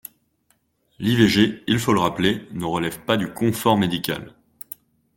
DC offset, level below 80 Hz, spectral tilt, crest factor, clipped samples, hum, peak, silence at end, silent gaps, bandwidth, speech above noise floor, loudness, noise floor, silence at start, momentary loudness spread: under 0.1%; -52 dBFS; -5.5 dB/octave; 20 dB; under 0.1%; none; -2 dBFS; 0.9 s; none; 17 kHz; 46 dB; -21 LUFS; -66 dBFS; 1 s; 20 LU